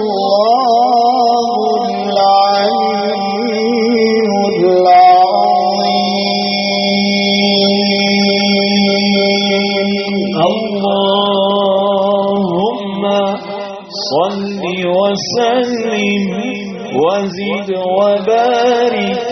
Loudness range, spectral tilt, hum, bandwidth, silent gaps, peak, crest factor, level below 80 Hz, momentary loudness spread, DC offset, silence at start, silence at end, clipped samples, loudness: 5 LU; -3 dB/octave; none; 6.4 kHz; none; 0 dBFS; 12 dB; -56 dBFS; 7 LU; under 0.1%; 0 s; 0 s; under 0.1%; -12 LUFS